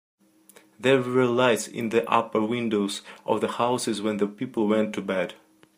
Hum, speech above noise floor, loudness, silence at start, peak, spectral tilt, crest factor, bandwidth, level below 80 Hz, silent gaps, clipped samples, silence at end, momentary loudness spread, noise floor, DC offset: none; 31 dB; -25 LUFS; 0.8 s; -6 dBFS; -5 dB/octave; 20 dB; 15.5 kHz; -72 dBFS; none; under 0.1%; 0.45 s; 7 LU; -56 dBFS; under 0.1%